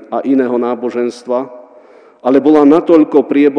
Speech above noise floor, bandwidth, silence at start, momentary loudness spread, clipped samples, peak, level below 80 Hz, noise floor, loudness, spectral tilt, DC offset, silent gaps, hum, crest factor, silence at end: 31 dB; 9.2 kHz; 0.1 s; 11 LU; 0.8%; 0 dBFS; -60 dBFS; -42 dBFS; -12 LUFS; -7 dB/octave; under 0.1%; none; none; 12 dB; 0 s